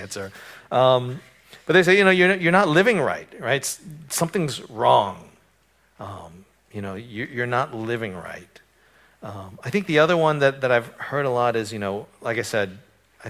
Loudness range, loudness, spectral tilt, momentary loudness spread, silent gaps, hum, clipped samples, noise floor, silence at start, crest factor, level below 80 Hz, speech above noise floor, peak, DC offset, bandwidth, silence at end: 11 LU; -21 LUFS; -4.5 dB/octave; 21 LU; none; none; under 0.1%; -62 dBFS; 0 s; 22 dB; -60 dBFS; 40 dB; 0 dBFS; under 0.1%; 16 kHz; 0 s